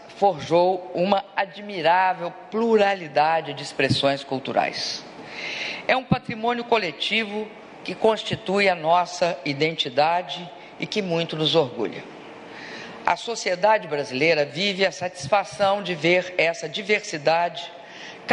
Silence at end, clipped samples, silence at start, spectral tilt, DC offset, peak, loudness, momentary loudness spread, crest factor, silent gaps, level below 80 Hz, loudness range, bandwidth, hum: 0 s; under 0.1%; 0 s; -4.5 dB/octave; under 0.1%; -2 dBFS; -23 LUFS; 14 LU; 22 dB; none; -60 dBFS; 3 LU; 11 kHz; none